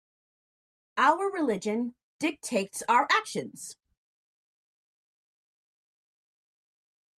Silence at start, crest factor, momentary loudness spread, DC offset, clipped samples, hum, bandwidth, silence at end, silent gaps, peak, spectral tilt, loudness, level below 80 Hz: 0.95 s; 22 dB; 14 LU; under 0.1%; under 0.1%; none; 14.5 kHz; 3.45 s; 2.03-2.19 s; -10 dBFS; -3.5 dB/octave; -28 LUFS; -80 dBFS